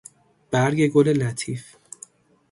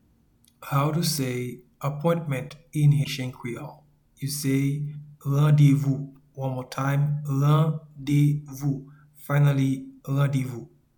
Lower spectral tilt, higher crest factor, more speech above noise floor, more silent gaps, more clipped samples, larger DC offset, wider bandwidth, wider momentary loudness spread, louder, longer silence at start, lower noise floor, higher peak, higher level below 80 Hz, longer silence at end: about the same, -6 dB/octave vs -6.5 dB/octave; about the same, 18 dB vs 16 dB; second, 28 dB vs 38 dB; neither; neither; neither; second, 11.5 kHz vs 19 kHz; first, 23 LU vs 14 LU; first, -21 LUFS vs -25 LUFS; about the same, 0.5 s vs 0.6 s; second, -49 dBFS vs -62 dBFS; about the same, -6 dBFS vs -8 dBFS; about the same, -60 dBFS vs -58 dBFS; first, 0.9 s vs 0.3 s